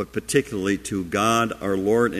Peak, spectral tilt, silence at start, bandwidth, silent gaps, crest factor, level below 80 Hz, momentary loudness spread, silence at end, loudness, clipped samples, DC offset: -4 dBFS; -4.5 dB/octave; 0 s; 15 kHz; none; 18 dB; -50 dBFS; 5 LU; 0 s; -23 LUFS; under 0.1%; under 0.1%